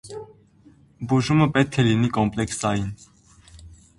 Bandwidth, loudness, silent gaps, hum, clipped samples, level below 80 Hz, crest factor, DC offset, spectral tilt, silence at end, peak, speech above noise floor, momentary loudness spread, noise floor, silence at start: 11.5 kHz; -22 LUFS; none; none; under 0.1%; -48 dBFS; 20 dB; under 0.1%; -6 dB/octave; 0.25 s; -2 dBFS; 32 dB; 19 LU; -54 dBFS; 0.05 s